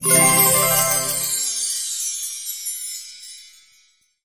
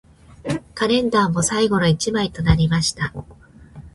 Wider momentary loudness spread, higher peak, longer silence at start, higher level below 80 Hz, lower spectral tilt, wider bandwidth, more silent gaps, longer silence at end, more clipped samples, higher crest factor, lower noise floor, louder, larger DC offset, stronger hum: first, 19 LU vs 10 LU; about the same, -2 dBFS vs -2 dBFS; second, 0 s vs 0.45 s; second, -56 dBFS vs -36 dBFS; second, -1.5 dB/octave vs -5 dB/octave; first, 16 kHz vs 11.5 kHz; neither; first, 0.75 s vs 0.05 s; neither; about the same, 20 dB vs 18 dB; first, -59 dBFS vs -42 dBFS; about the same, -17 LUFS vs -19 LUFS; neither; neither